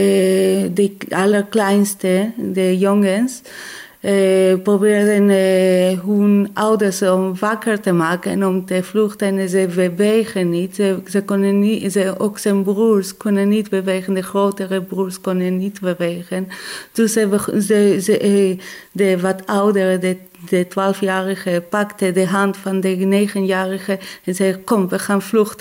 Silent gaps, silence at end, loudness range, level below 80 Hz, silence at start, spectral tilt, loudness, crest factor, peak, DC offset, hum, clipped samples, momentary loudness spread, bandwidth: none; 0.05 s; 4 LU; -64 dBFS; 0 s; -6 dB/octave; -17 LUFS; 12 dB; -4 dBFS; under 0.1%; none; under 0.1%; 8 LU; 16 kHz